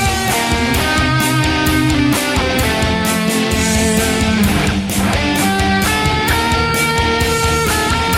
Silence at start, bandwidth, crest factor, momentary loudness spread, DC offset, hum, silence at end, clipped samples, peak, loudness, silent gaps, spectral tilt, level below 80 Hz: 0 s; 16.5 kHz; 12 dB; 1 LU; under 0.1%; none; 0 s; under 0.1%; -2 dBFS; -14 LUFS; none; -4 dB/octave; -26 dBFS